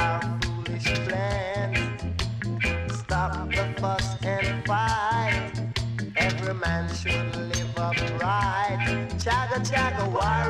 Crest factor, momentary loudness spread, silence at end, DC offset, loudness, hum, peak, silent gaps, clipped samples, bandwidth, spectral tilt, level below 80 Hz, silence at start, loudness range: 16 dB; 5 LU; 0 s; under 0.1%; -26 LUFS; none; -10 dBFS; none; under 0.1%; 12.5 kHz; -5 dB/octave; -38 dBFS; 0 s; 2 LU